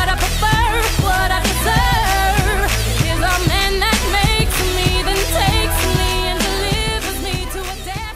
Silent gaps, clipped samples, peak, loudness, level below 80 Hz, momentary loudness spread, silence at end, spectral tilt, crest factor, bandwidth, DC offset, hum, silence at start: none; under 0.1%; -2 dBFS; -16 LUFS; -22 dBFS; 6 LU; 0 s; -3.5 dB/octave; 14 dB; 16 kHz; under 0.1%; none; 0 s